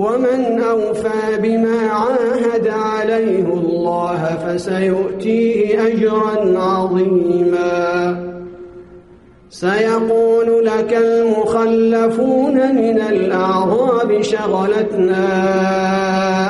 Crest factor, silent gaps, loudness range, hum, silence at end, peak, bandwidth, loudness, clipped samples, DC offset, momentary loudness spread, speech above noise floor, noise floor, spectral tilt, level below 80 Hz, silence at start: 12 dB; none; 3 LU; none; 0 s; -4 dBFS; 11.5 kHz; -15 LUFS; under 0.1%; under 0.1%; 5 LU; 29 dB; -44 dBFS; -6.5 dB/octave; -52 dBFS; 0 s